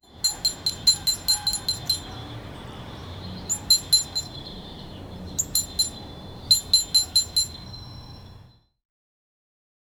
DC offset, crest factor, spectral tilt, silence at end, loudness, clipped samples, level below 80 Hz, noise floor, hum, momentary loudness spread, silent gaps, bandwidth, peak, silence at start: under 0.1%; 22 dB; -0.5 dB/octave; 1.5 s; -21 LUFS; under 0.1%; -48 dBFS; -51 dBFS; none; 21 LU; none; over 20 kHz; -6 dBFS; 0.1 s